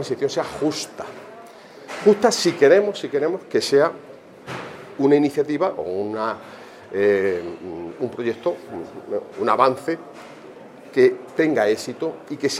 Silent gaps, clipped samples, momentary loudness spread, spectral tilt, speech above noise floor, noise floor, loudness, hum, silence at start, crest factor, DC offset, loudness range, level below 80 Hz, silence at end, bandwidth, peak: none; under 0.1%; 22 LU; -4.5 dB/octave; 22 dB; -42 dBFS; -21 LUFS; none; 0 s; 20 dB; under 0.1%; 5 LU; -66 dBFS; 0 s; 14.5 kHz; -2 dBFS